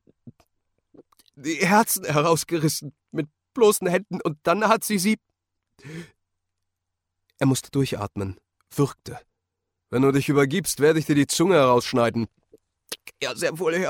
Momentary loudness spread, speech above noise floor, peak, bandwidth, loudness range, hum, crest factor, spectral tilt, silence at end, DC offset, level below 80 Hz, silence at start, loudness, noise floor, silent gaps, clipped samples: 16 LU; 59 dB; -4 dBFS; 17 kHz; 7 LU; none; 20 dB; -5 dB/octave; 0 s; under 0.1%; -60 dBFS; 0.25 s; -22 LUFS; -81 dBFS; none; under 0.1%